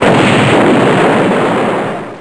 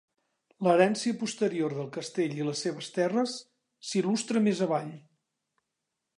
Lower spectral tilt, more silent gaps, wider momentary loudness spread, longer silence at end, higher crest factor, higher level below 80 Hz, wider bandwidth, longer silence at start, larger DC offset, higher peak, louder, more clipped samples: about the same, -6 dB/octave vs -5 dB/octave; neither; second, 7 LU vs 10 LU; second, 0 s vs 1.2 s; second, 10 dB vs 22 dB; first, -42 dBFS vs -82 dBFS; about the same, 11 kHz vs 11 kHz; second, 0 s vs 0.6 s; neither; first, 0 dBFS vs -8 dBFS; first, -10 LUFS vs -29 LUFS; neither